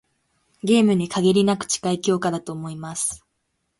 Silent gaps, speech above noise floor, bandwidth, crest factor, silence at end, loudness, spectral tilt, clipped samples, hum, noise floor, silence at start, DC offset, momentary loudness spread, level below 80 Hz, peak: none; 53 dB; 11.5 kHz; 16 dB; 0.6 s; -21 LUFS; -5 dB/octave; under 0.1%; none; -74 dBFS; 0.65 s; under 0.1%; 13 LU; -60 dBFS; -6 dBFS